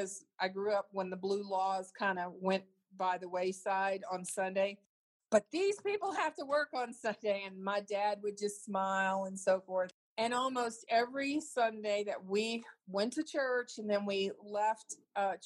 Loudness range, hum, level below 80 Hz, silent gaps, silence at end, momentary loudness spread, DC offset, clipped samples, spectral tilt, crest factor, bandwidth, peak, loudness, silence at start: 2 LU; none; -88 dBFS; 4.86-5.20 s, 9.94-10.16 s; 0 s; 5 LU; under 0.1%; under 0.1%; -4 dB/octave; 20 dB; 12.5 kHz; -16 dBFS; -36 LUFS; 0 s